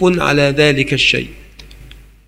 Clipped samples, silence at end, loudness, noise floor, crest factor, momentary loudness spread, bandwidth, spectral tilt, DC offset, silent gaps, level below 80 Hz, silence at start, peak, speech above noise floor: under 0.1%; 0.4 s; -13 LUFS; -39 dBFS; 16 dB; 6 LU; 15.5 kHz; -5 dB/octave; under 0.1%; none; -38 dBFS; 0 s; 0 dBFS; 25 dB